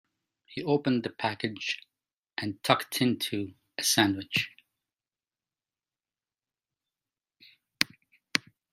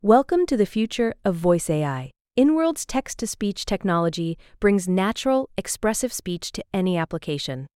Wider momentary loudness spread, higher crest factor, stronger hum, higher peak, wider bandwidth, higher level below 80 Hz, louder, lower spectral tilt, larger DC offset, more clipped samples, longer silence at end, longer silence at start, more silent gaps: first, 12 LU vs 9 LU; first, 32 dB vs 18 dB; neither; first, 0 dBFS vs -4 dBFS; about the same, 16 kHz vs 16.5 kHz; second, -74 dBFS vs -48 dBFS; second, -29 LUFS vs -23 LUFS; second, -3.5 dB/octave vs -5 dB/octave; neither; neither; first, 0.35 s vs 0.1 s; first, 0.5 s vs 0.05 s; about the same, 2.18-2.23 s vs 2.21-2.25 s